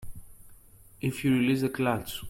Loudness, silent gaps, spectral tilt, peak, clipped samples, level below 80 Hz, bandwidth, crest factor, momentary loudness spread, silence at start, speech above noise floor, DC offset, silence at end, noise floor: -28 LUFS; none; -6 dB/octave; -14 dBFS; under 0.1%; -52 dBFS; 16.5 kHz; 16 dB; 8 LU; 0 s; 26 dB; under 0.1%; 0 s; -53 dBFS